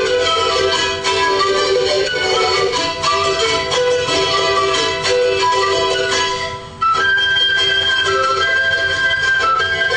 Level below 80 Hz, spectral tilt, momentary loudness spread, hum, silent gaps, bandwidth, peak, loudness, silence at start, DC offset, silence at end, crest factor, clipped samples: -44 dBFS; -2 dB/octave; 3 LU; none; none; 10 kHz; -2 dBFS; -14 LUFS; 0 s; under 0.1%; 0 s; 14 dB; under 0.1%